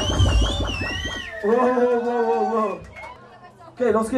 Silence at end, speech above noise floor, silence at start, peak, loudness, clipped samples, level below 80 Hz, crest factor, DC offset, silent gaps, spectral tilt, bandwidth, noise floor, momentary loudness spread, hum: 0 s; 25 dB; 0 s; -6 dBFS; -22 LUFS; under 0.1%; -30 dBFS; 16 dB; under 0.1%; none; -5.5 dB/octave; 13 kHz; -45 dBFS; 13 LU; none